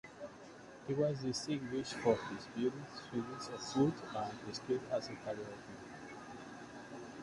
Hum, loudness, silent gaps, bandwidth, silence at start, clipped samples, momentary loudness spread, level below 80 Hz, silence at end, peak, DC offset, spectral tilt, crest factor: none; -39 LUFS; none; 11.5 kHz; 0.05 s; under 0.1%; 16 LU; -70 dBFS; 0 s; -18 dBFS; under 0.1%; -5.5 dB/octave; 22 dB